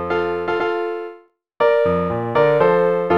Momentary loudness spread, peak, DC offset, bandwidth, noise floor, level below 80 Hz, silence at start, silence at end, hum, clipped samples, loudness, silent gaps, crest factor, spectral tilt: 10 LU; -4 dBFS; 0.3%; 6 kHz; -45 dBFS; -52 dBFS; 0 s; 0 s; none; under 0.1%; -18 LUFS; none; 14 dB; -8 dB/octave